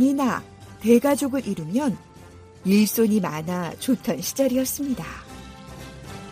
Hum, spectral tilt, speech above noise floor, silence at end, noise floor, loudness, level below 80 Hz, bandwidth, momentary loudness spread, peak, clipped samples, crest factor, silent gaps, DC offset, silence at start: none; -5 dB/octave; 24 dB; 0 s; -45 dBFS; -23 LUFS; -52 dBFS; 15.5 kHz; 21 LU; -6 dBFS; under 0.1%; 18 dB; none; under 0.1%; 0 s